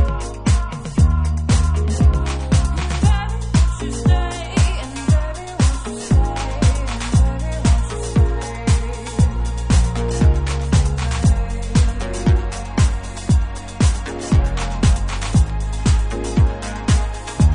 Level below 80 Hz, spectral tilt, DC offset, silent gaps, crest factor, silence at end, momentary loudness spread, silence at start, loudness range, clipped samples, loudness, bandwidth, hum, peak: -20 dBFS; -6 dB/octave; under 0.1%; none; 12 dB; 0 s; 5 LU; 0 s; 1 LU; under 0.1%; -19 LUFS; 11 kHz; none; -4 dBFS